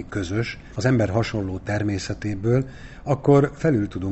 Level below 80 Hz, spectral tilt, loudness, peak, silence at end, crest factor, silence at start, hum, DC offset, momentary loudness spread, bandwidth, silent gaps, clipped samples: -44 dBFS; -7 dB/octave; -23 LUFS; -6 dBFS; 0 s; 16 dB; 0 s; none; under 0.1%; 10 LU; 8.4 kHz; none; under 0.1%